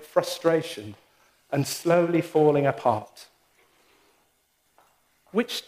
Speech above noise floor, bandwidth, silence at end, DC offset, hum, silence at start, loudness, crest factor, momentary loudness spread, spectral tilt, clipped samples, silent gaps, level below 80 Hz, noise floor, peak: 45 dB; 15.5 kHz; 0.05 s; under 0.1%; none; 0 s; -24 LUFS; 20 dB; 15 LU; -5.5 dB/octave; under 0.1%; none; -72 dBFS; -69 dBFS; -6 dBFS